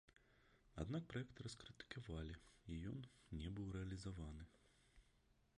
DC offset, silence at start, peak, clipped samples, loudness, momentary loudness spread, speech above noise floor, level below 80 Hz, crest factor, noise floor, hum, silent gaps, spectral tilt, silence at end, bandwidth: under 0.1%; 0.1 s; -34 dBFS; under 0.1%; -53 LUFS; 9 LU; 26 dB; -62 dBFS; 20 dB; -78 dBFS; none; none; -6 dB/octave; 0.6 s; 11 kHz